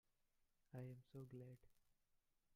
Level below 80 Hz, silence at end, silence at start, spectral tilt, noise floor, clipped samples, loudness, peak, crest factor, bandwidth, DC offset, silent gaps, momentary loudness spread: -84 dBFS; 0 s; 0.4 s; -8.5 dB/octave; -85 dBFS; under 0.1%; -60 LUFS; -42 dBFS; 20 dB; 15.5 kHz; under 0.1%; none; 6 LU